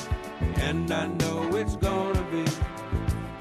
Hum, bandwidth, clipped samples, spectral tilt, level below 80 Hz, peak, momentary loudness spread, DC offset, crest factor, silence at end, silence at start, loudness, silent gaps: none; 14.5 kHz; under 0.1%; -6 dB/octave; -34 dBFS; -12 dBFS; 4 LU; under 0.1%; 14 dB; 0 s; 0 s; -28 LUFS; none